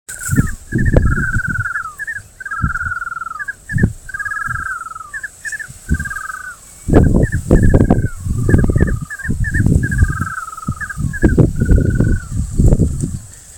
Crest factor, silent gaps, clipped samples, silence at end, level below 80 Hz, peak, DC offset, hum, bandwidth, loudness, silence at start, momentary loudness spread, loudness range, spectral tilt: 16 dB; none; 0.4%; 0 s; -20 dBFS; 0 dBFS; under 0.1%; none; 17.5 kHz; -17 LUFS; 0.1 s; 12 LU; 7 LU; -7.5 dB/octave